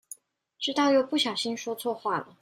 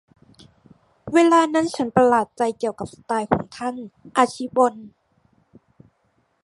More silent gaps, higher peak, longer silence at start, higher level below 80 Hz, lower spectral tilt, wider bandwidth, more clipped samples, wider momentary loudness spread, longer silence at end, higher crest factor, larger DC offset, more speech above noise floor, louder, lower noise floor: neither; second, -14 dBFS vs -2 dBFS; second, 0.1 s vs 1.05 s; second, -80 dBFS vs -58 dBFS; second, -3 dB/octave vs -5 dB/octave; first, 16 kHz vs 11.5 kHz; neither; second, 11 LU vs 14 LU; second, 0.2 s vs 1.55 s; about the same, 16 dB vs 20 dB; neither; second, 25 dB vs 46 dB; second, -27 LUFS vs -20 LUFS; second, -53 dBFS vs -67 dBFS